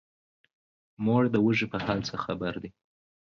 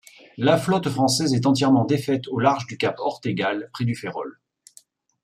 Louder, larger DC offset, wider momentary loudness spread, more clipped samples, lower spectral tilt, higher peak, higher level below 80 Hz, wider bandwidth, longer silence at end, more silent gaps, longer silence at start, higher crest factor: second, -28 LUFS vs -22 LUFS; neither; first, 11 LU vs 8 LU; neither; first, -7 dB/octave vs -5.5 dB/octave; second, -10 dBFS vs -4 dBFS; first, -58 dBFS vs -64 dBFS; second, 7 kHz vs 15 kHz; second, 0.65 s vs 0.95 s; neither; first, 1 s vs 0.35 s; about the same, 18 dB vs 18 dB